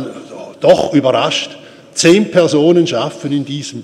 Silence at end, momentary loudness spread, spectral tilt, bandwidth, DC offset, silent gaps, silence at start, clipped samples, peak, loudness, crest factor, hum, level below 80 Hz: 0 s; 15 LU; -4.5 dB/octave; 12.5 kHz; under 0.1%; none; 0 s; under 0.1%; 0 dBFS; -13 LUFS; 14 dB; none; -54 dBFS